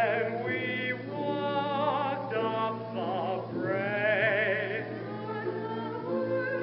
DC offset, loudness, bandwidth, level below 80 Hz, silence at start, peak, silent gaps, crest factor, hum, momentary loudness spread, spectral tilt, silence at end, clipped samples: under 0.1%; -31 LUFS; 5.8 kHz; -78 dBFS; 0 s; -16 dBFS; none; 14 dB; none; 9 LU; -4 dB/octave; 0 s; under 0.1%